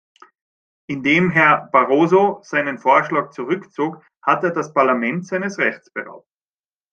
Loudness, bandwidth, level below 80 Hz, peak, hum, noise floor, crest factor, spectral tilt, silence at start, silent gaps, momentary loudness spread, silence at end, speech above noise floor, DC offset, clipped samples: -18 LUFS; 7.4 kHz; -64 dBFS; -2 dBFS; none; under -90 dBFS; 18 dB; -6.5 dB/octave; 0.9 s; 4.17-4.21 s; 11 LU; 0.75 s; over 72 dB; under 0.1%; under 0.1%